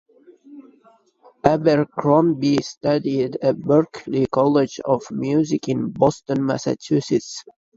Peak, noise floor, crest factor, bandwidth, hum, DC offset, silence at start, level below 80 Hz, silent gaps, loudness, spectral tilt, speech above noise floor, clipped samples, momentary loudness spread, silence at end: 0 dBFS; -46 dBFS; 20 dB; 7.8 kHz; none; under 0.1%; 0.5 s; -56 dBFS; 2.77-2.81 s; -20 LUFS; -6.5 dB/octave; 27 dB; under 0.1%; 6 LU; 0.35 s